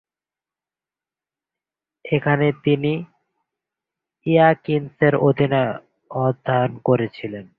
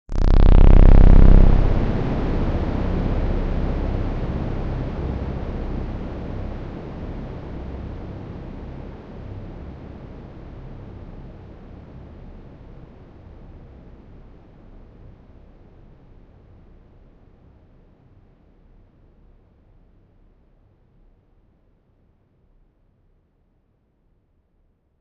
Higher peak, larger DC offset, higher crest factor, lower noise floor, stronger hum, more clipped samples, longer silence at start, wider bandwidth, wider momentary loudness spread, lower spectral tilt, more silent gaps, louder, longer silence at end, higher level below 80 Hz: about the same, -2 dBFS vs -2 dBFS; neither; about the same, 18 dB vs 18 dB; first, under -90 dBFS vs -64 dBFS; neither; neither; first, 2.05 s vs 0.1 s; about the same, 4.8 kHz vs 4.7 kHz; second, 12 LU vs 30 LU; first, -11 dB/octave vs -9.5 dB/octave; neither; about the same, -20 LUFS vs -22 LUFS; second, 0.15 s vs 13 s; second, -58 dBFS vs -22 dBFS